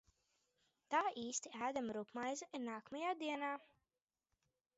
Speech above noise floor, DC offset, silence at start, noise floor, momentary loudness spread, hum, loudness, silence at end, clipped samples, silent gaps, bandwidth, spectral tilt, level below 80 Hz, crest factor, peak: over 47 dB; under 0.1%; 0.9 s; under -90 dBFS; 8 LU; none; -43 LUFS; 1.15 s; under 0.1%; none; 7.6 kHz; -2 dB/octave; -86 dBFS; 22 dB; -24 dBFS